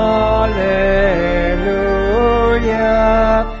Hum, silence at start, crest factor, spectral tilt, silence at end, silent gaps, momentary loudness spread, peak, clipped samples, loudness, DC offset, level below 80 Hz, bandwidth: none; 0 s; 12 dB; -4.5 dB/octave; 0 s; none; 3 LU; -2 dBFS; under 0.1%; -14 LUFS; under 0.1%; -22 dBFS; 7.4 kHz